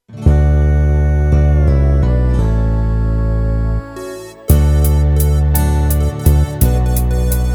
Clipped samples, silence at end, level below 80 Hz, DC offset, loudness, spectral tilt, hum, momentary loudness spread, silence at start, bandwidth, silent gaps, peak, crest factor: under 0.1%; 0 s; -14 dBFS; under 0.1%; -14 LUFS; -7 dB/octave; none; 5 LU; 0.1 s; over 20 kHz; none; -2 dBFS; 12 dB